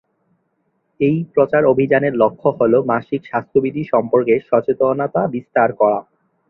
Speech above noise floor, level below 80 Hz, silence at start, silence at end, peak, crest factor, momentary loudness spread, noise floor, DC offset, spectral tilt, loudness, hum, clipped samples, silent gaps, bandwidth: 51 dB; -58 dBFS; 1 s; 0.5 s; -2 dBFS; 16 dB; 6 LU; -67 dBFS; under 0.1%; -10.5 dB/octave; -17 LUFS; none; under 0.1%; none; 4.1 kHz